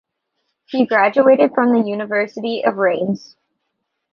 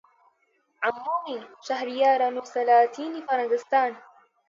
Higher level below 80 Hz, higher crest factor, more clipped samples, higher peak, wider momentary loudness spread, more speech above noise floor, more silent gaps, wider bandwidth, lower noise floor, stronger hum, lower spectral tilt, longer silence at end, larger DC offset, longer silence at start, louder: first, -66 dBFS vs -84 dBFS; about the same, 16 dB vs 18 dB; neither; first, -2 dBFS vs -8 dBFS; about the same, 10 LU vs 11 LU; first, 58 dB vs 45 dB; neither; second, 6.6 kHz vs 7.6 kHz; first, -74 dBFS vs -69 dBFS; neither; first, -7 dB/octave vs -3 dB/octave; first, 0.95 s vs 0.5 s; neither; about the same, 0.7 s vs 0.8 s; first, -16 LUFS vs -25 LUFS